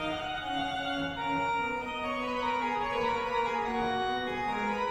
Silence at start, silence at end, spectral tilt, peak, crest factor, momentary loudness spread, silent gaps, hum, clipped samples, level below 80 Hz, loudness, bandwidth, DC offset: 0 s; 0 s; -4.5 dB/octave; -18 dBFS; 12 dB; 3 LU; none; none; under 0.1%; -54 dBFS; -31 LUFS; over 20 kHz; under 0.1%